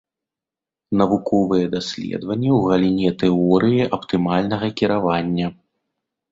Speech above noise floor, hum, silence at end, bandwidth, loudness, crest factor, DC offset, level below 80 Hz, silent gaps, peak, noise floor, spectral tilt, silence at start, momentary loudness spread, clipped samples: 70 dB; none; 0.8 s; 7.8 kHz; -19 LUFS; 18 dB; under 0.1%; -50 dBFS; none; -2 dBFS; -88 dBFS; -7.5 dB/octave; 0.9 s; 8 LU; under 0.1%